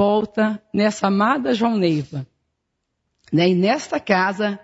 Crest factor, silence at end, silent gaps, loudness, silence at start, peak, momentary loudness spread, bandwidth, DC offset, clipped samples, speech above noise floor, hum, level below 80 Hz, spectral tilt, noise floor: 16 dB; 0.05 s; none; -19 LUFS; 0 s; -4 dBFS; 6 LU; 8 kHz; under 0.1%; under 0.1%; 57 dB; none; -60 dBFS; -6 dB/octave; -76 dBFS